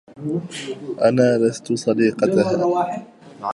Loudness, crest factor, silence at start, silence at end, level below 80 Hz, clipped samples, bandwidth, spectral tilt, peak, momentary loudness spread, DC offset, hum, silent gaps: -20 LUFS; 16 dB; 0.15 s; 0 s; -64 dBFS; under 0.1%; 11.5 kHz; -6 dB/octave; -4 dBFS; 13 LU; under 0.1%; none; none